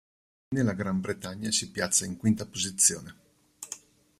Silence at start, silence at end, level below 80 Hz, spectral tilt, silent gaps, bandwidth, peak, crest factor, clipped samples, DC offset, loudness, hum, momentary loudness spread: 0.5 s; 0.45 s; -62 dBFS; -3 dB/octave; none; 15.5 kHz; -8 dBFS; 24 dB; under 0.1%; under 0.1%; -27 LUFS; none; 18 LU